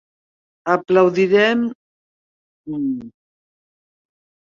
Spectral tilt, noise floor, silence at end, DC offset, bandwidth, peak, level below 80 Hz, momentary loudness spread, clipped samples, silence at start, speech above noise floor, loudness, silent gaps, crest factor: -6.5 dB/octave; under -90 dBFS; 1.35 s; under 0.1%; 7.4 kHz; -2 dBFS; -64 dBFS; 15 LU; under 0.1%; 0.65 s; over 73 dB; -17 LUFS; 1.75-2.64 s; 20 dB